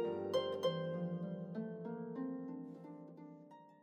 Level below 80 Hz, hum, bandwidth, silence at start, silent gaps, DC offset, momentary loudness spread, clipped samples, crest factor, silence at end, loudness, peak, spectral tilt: under -90 dBFS; none; 14 kHz; 0 s; none; under 0.1%; 17 LU; under 0.1%; 18 dB; 0.05 s; -42 LUFS; -24 dBFS; -7 dB/octave